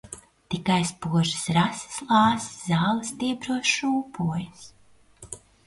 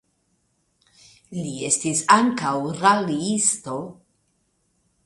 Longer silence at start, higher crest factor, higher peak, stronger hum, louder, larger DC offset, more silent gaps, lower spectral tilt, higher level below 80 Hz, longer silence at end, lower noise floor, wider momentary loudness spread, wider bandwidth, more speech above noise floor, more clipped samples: second, 0.05 s vs 1.3 s; about the same, 18 dB vs 22 dB; second, -8 dBFS vs -2 dBFS; neither; second, -25 LUFS vs -21 LUFS; neither; neither; first, -4.5 dB/octave vs -3 dB/octave; first, -58 dBFS vs -66 dBFS; second, 0.3 s vs 1.1 s; second, -53 dBFS vs -69 dBFS; first, 20 LU vs 15 LU; about the same, 11.5 kHz vs 11.5 kHz; second, 28 dB vs 48 dB; neither